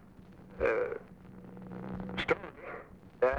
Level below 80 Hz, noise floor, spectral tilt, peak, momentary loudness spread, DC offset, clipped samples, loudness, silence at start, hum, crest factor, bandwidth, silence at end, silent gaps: -56 dBFS; -54 dBFS; -6.5 dB/octave; -16 dBFS; 21 LU; under 0.1%; under 0.1%; -36 LUFS; 0 s; none; 20 dB; 8.8 kHz; 0 s; none